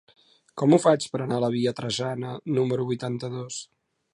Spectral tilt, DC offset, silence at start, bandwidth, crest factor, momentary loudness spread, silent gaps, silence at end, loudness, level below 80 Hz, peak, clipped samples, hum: -6 dB/octave; under 0.1%; 0.55 s; 11.5 kHz; 20 dB; 14 LU; none; 0.5 s; -25 LUFS; -68 dBFS; -6 dBFS; under 0.1%; none